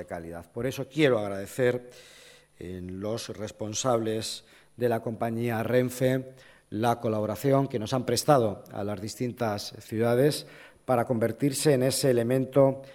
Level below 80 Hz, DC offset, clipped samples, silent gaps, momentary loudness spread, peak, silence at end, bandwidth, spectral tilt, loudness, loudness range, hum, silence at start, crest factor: -62 dBFS; under 0.1%; under 0.1%; none; 14 LU; -8 dBFS; 0 s; 17 kHz; -5.5 dB/octave; -27 LUFS; 5 LU; none; 0 s; 20 dB